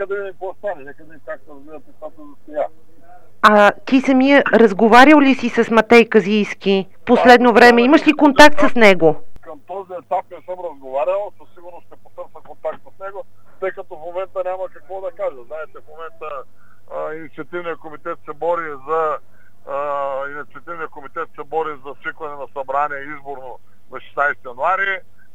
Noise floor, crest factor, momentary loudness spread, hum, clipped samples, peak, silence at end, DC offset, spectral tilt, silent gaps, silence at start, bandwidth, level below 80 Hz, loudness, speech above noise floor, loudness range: -48 dBFS; 16 dB; 23 LU; none; under 0.1%; 0 dBFS; 0 s; 2%; -5 dB/octave; none; 0 s; 16 kHz; -50 dBFS; -14 LUFS; 32 dB; 18 LU